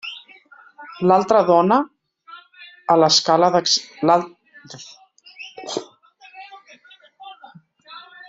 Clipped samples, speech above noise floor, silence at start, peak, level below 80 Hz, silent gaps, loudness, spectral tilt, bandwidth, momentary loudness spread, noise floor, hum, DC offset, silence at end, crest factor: under 0.1%; 33 dB; 0.05 s; -2 dBFS; -68 dBFS; none; -17 LUFS; -4 dB/octave; 8 kHz; 26 LU; -49 dBFS; none; under 0.1%; 0.3 s; 18 dB